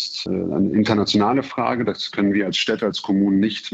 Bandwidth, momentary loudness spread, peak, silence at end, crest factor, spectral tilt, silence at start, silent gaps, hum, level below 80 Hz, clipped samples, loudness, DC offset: 8 kHz; 5 LU; -6 dBFS; 0 s; 14 dB; -5.5 dB/octave; 0 s; none; none; -58 dBFS; under 0.1%; -20 LUFS; under 0.1%